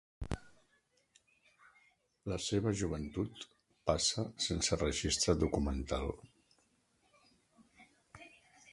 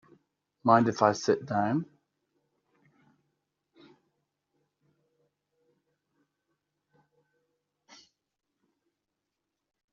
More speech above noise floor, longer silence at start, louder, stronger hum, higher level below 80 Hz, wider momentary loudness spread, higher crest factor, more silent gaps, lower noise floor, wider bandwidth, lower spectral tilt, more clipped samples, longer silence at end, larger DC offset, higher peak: second, 40 dB vs 60 dB; second, 0.2 s vs 0.65 s; second, -36 LUFS vs -27 LUFS; neither; first, -50 dBFS vs -78 dBFS; first, 21 LU vs 10 LU; about the same, 24 dB vs 28 dB; neither; second, -75 dBFS vs -86 dBFS; first, 11.5 kHz vs 7.2 kHz; second, -4 dB/octave vs -5.5 dB/octave; neither; second, 0.45 s vs 8.1 s; neither; second, -16 dBFS vs -6 dBFS